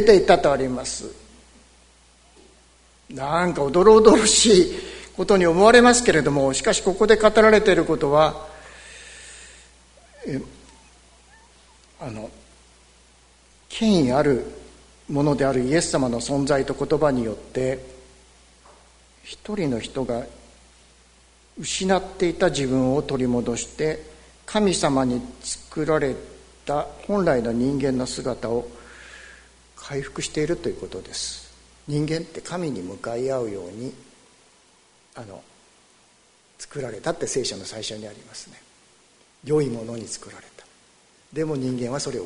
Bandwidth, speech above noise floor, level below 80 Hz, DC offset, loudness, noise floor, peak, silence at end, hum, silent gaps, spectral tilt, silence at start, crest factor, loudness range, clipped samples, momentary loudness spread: 11 kHz; 37 dB; -46 dBFS; under 0.1%; -21 LUFS; -58 dBFS; 0 dBFS; 0 s; none; none; -4.5 dB/octave; 0 s; 22 dB; 17 LU; under 0.1%; 25 LU